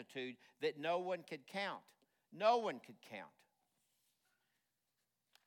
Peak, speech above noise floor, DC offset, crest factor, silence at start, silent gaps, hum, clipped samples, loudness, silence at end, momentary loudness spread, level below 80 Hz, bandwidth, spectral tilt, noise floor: -22 dBFS; 46 dB; under 0.1%; 22 dB; 0 s; none; none; under 0.1%; -41 LUFS; 2.2 s; 18 LU; under -90 dBFS; 17 kHz; -4.5 dB/octave; -88 dBFS